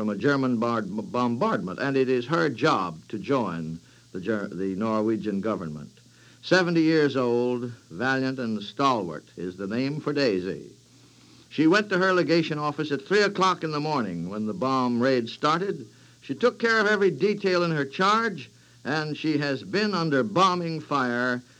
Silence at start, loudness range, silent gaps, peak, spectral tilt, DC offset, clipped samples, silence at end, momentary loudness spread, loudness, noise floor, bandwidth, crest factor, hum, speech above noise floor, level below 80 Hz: 0 s; 3 LU; none; -6 dBFS; -6 dB/octave; under 0.1%; under 0.1%; 0.2 s; 13 LU; -25 LUFS; -54 dBFS; 10.5 kHz; 20 dB; none; 29 dB; -70 dBFS